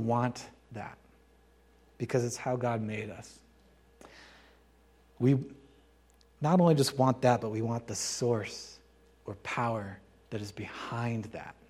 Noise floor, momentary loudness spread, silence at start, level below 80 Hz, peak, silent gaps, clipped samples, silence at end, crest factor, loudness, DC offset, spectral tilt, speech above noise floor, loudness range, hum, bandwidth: -63 dBFS; 21 LU; 0 s; -64 dBFS; -12 dBFS; none; under 0.1%; 0.15 s; 22 dB; -31 LUFS; under 0.1%; -5.5 dB/octave; 32 dB; 8 LU; none; 14.5 kHz